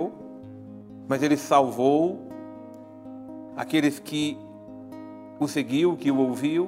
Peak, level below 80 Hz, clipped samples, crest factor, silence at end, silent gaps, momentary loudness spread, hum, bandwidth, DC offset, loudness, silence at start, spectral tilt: -6 dBFS; -70 dBFS; under 0.1%; 20 dB; 0 s; none; 21 LU; none; 16 kHz; under 0.1%; -24 LUFS; 0 s; -5.5 dB/octave